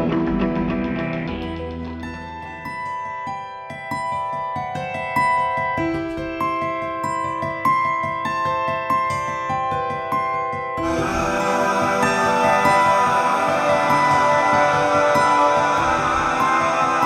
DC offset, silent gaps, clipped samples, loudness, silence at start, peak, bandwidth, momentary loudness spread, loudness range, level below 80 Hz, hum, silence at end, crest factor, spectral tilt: under 0.1%; none; under 0.1%; -20 LUFS; 0 s; -4 dBFS; 15 kHz; 12 LU; 11 LU; -44 dBFS; none; 0 s; 16 dB; -5 dB/octave